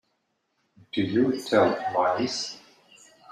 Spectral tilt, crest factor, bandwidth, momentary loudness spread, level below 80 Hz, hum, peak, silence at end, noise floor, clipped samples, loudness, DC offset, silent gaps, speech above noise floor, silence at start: -5 dB/octave; 20 dB; 14.5 kHz; 11 LU; -70 dBFS; none; -6 dBFS; 0.75 s; -75 dBFS; under 0.1%; -25 LUFS; under 0.1%; none; 51 dB; 0.95 s